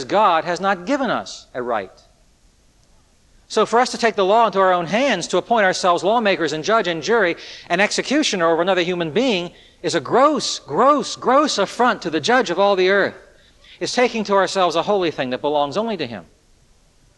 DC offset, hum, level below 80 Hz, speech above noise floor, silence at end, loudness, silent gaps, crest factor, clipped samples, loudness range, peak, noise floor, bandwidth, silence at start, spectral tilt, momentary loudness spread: under 0.1%; none; -58 dBFS; 37 dB; 0.95 s; -18 LUFS; none; 16 dB; under 0.1%; 4 LU; -2 dBFS; -55 dBFS; 11.5 kHz; 0 s; -3.5 dB/octave; 9 LU